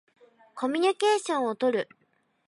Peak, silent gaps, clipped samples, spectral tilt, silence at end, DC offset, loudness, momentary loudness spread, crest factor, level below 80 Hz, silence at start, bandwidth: -12 dBFS; none; under 0.1%; -3 dB/octave; 0.65 s; under 0.1%; -27 LUFS; 12 LU; 16 dB; -86 dBFS; 0.55 s; 11.5 kHz